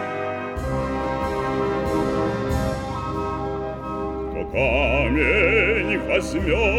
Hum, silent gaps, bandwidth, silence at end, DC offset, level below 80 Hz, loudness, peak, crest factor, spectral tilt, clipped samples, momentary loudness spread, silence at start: none; none; 14 kHz; 0 s; under 0.1%; -32 dBFS; -22 LUFS; -6 dBFS; 16 dB; -6 dB/octave; under 0.1%; 10 LU; 0 s